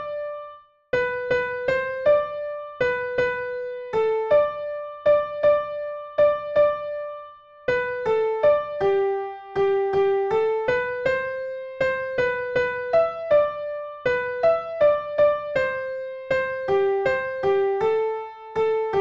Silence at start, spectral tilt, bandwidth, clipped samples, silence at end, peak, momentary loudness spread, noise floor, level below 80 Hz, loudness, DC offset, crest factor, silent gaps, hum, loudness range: 0 s; -6 dB/octave; 7.4 kHz; under 0.1%; 0 s; -10 dBFS; 10 LU; -45 dBFS; -56 dBFS; -23 LUFS; under 0.1%; 14 dB; none; none; 2 LU